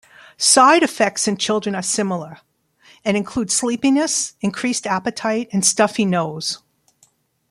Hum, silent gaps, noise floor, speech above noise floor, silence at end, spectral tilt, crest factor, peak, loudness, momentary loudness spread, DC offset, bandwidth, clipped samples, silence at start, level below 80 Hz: none; none; -59 dBFS; 41 dB; 0.95 s; -3 dB/octave; 20 dB; 0 dBFS; -18 LUFS; 11 LU; under 0.1%; 14.5 kHz; under 0.1%; 0.4 s; -60 dBFS